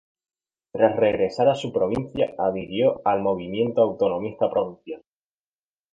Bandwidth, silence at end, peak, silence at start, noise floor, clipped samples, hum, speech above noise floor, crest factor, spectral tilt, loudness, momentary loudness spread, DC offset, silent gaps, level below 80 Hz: 7.8 kHz; 0.95 s; -4 dBFS; 0.75 s; under -90 dBFS; under 0.1%; none; over 68 dB; 20 dB; -7 dB/octave; -23 LUFS; 8 LU; under 0.1%; none; -56 dBFS